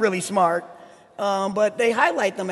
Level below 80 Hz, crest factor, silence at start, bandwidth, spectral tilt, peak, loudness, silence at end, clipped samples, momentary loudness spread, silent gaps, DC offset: -70 dBFS; 18 dB; 0 s; 12.5 kHz; -4 dB/octave; -4 dBFS; -22 LUFS; 0 s; under 0.1%; 6 LU; none; under 0.1%